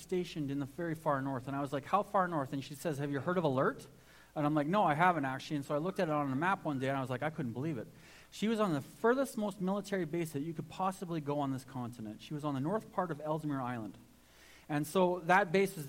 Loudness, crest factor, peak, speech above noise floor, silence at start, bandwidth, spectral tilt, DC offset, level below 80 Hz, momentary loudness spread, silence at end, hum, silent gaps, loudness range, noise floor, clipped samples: -35 LUFS; 20 dB; -14 dBFS; 26 dB; 0 s; 16.5 kHz; -6.5 dB/octave; under 0.1%; -68 dBFS; 10 LU; 0 s; none; none; 5 LU; -60 dBFS; under 0.1%